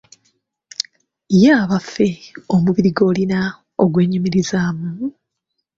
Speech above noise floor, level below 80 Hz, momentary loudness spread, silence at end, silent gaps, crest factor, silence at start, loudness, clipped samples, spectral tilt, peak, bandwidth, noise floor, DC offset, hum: 60 dB; -52 dBFS; 14 LU; 0.7 s; none; 18 dB; 1.3 s; -17 LUFS; under 0.1%; -6.5 dB/octave; 0 dBFS; 7.8 kHz; -75 dBFS; under 0.1%; none